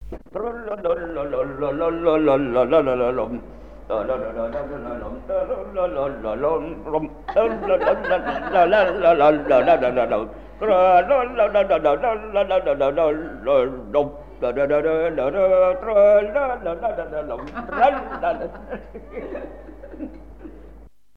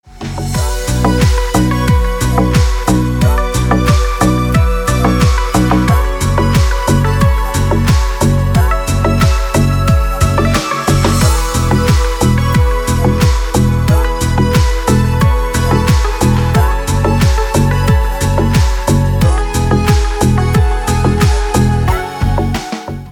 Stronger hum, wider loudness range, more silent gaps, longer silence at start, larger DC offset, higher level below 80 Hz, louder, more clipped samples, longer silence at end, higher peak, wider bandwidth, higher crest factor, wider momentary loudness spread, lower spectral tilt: neither; first, 8 LU vs 1 LU; neither; second, 0 s vs 0.15 s; first, 0.4% vs under 0.1%; second, -42 dBFS vs -16 dBFS; second, -20 LUFS vs -13 LUFS; neither; first, 0.3 s vs 0 s; second, -4 dBFS vs 0 dBFS; second, 5.2 kHz vs 19 kHz; about the same, 16 dB vs 12 dB; first, 16 LU vs 3 LU; first, -7.5 dB/octave vs -6 dB/octave